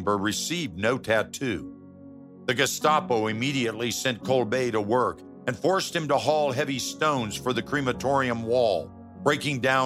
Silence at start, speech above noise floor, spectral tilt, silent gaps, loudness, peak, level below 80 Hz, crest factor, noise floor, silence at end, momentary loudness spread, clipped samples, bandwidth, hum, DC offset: 0 s; 20 dB; -4 dB/octave; none; -26 LUFS; -6 dBFS; -60 dBFS; 20 dB; -46 dBFS; 0 s; 6 LU; under 0.1%; 16 kHz; none; under 0.1%